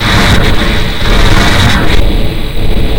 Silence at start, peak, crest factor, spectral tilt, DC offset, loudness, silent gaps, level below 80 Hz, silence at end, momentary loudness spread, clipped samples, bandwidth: 0 s; 0 dBFS; 6 dB; -5 dB/octave; under 0.1%; -10 LUFS; none; -10 dBFS; 0 s; 8 LU; 3%; 17.5 kHz